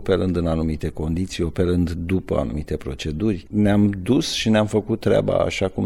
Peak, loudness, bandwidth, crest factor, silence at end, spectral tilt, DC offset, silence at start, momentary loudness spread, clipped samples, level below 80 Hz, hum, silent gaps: -6 dBFS; -21 LUFS; 13.5 kHz; 14 dB; 0 s; -6.5 dB/octave; 0.2%; 0 s; 7 LU; under 0.1%; -36 dBFS; none; none